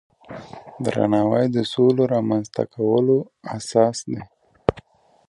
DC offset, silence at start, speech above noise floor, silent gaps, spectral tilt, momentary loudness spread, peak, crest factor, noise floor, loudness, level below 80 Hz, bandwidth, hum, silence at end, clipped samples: under 0.1%; 0.3 s; 29 dB; none; -6.5 dB/octave; 17 LU; 0 dBFS; 22 dB; -50 dBFS; -21 LUFS; -52 dBFS; 11.5 kHz; none; 0.5 s; under 0.1%